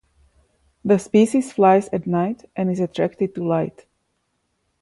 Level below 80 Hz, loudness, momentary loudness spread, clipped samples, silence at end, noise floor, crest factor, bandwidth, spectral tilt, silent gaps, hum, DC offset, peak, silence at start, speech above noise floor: -60 dBFS; -20 LUFS; 9 LU; under 0.1%; 1.1 s; -71 dBFS; 18 dB; 11.5 kHz; -7 dB/octave; none; none; under 0.1%; -4 dBFS; 0.85 s; 52 dB